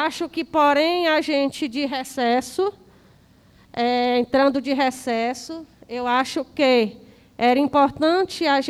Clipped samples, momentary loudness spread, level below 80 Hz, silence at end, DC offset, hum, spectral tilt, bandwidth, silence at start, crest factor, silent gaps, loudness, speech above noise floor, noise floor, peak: under 0.1%; 9 LU; -58 dBFS; 0 s; under 0.1%; none; -3.5 dB/octave; 14 kHz; 0 s; 16 dB; none; -21 LUFS; 33 dB; -53 dBFS; -6 dBFS